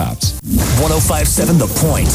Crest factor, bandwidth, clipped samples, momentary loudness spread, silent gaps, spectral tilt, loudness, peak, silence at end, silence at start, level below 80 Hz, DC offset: 12 dB; over 20 kHz; under 0.1%; 5 LU; none; -4.5 dB/octave; -14 LUFS; -2 dBFS; 0 s; 0 s; -22 dBFS; under 0.1%